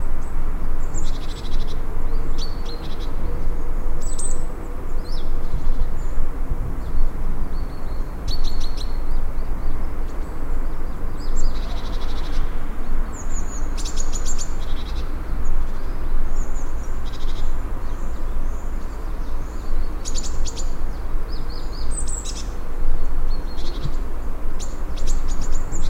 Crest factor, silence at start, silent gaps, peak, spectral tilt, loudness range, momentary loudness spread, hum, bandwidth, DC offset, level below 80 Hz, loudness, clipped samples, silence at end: 12 dB; 0 s; none; -4 dBFS; -4.5 dB/octave; 1 LU; 4 LU; none; 8.8 kHz; under 0.1%; -20 dBFS; -30 LUFS; under 0.1%; 0 s